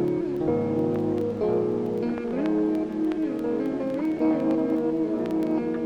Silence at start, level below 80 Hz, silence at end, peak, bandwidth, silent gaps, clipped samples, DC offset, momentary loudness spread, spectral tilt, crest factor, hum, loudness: 0 s; -56 dBFS; 0 s; -12 dBFS; 6.6 kHz; none; under 0.1%; under 0.1%; 3 LU; -9 dB/octave; 14 dB; none; -26 LUFS